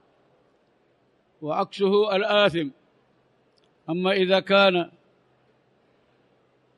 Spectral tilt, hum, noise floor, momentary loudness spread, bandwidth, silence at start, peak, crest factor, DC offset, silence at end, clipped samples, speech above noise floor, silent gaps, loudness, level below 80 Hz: -6 dB/octave; none; -65 dBFS; 16 LU; 10.5 kHz; 1.4 s; -6 dBFS; 20 dB; under 0.1%; 1.9 s; under 0.1%; 43 dB; none; -22 LUFS; -70 dBFS